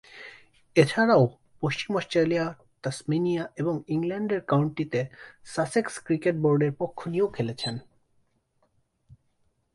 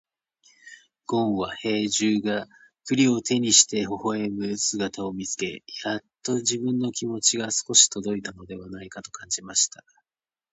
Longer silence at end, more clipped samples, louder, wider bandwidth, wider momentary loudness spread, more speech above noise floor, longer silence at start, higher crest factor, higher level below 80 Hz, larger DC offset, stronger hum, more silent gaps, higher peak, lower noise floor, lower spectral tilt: first, 1.95 s vs 0.85 s; neither; second, -26 LUFS vs -23 LUFS; first, 11.5 kHz vs 9 kHz; second, 13 LU vs 21 LU; second, 45 dB vs over 65 dB; second, 0.15 s vs 0.65 s; about the same, 22 dB vs 24 dB; about the same, -64 dBFS vs -62 dBFS; neither; neither; neither; second, -6 dBFS vs -2 dBFS; second, -70 dBFS vs under -90 dBFS; first, -6.5 dB/octave vs -2.5 dB/octave